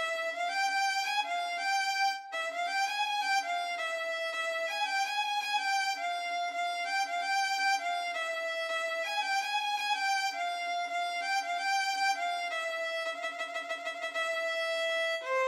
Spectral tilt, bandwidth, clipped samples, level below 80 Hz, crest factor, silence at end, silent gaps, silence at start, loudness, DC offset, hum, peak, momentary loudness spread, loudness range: 3 dB/octave; 16 kHz; under 0.1%; under -90 dBFS; 14 dB; 0 s; none; 0 s; -31 LUFS; under 0.1%; none; -18 dBFS; 4 LU; 2 LU